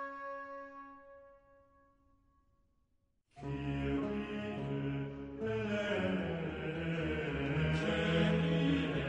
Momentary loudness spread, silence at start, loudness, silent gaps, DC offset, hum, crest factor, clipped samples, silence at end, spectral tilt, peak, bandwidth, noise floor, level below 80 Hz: 15 LU; 0 s; -36 LUFS; none; under 0.1%; none; 16 dB; under 0.1%; 0 s; -7.5 dB/octave; -20 dBFS; 8.6 kHz; -76 dBFS; -54 dBFS